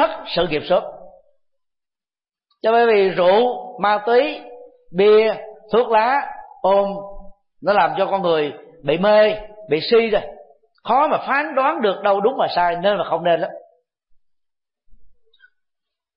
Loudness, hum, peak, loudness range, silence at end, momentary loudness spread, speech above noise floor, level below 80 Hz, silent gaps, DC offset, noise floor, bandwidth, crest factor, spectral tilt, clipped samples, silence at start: -18 LUFS; none; -6 dBFS; 4 LU; 1.1 s; 13 LU; over 73 dB; -50 dBFS; none; under 0.1%; under -90 dBFS; 5.4 kHz; 14 dB; -10 dB/octave; under 0.1%; 0 s